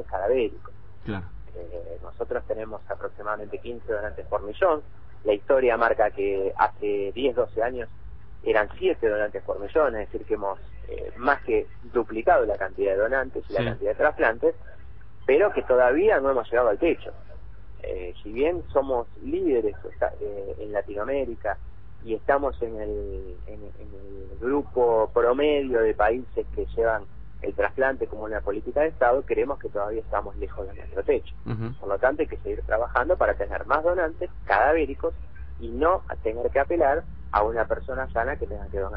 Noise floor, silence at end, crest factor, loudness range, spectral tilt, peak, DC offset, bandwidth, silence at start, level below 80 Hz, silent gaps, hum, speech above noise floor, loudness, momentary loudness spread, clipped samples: -46 dBFS; 0 s; 20 dB; 6 LU; -9.5 dB/octave; -6 dBFS; 1%; 5.4 kHz; 0 s; -42 dBFS; none; none; 21 dB; -26 LUFS; 14 LU; under 0.1%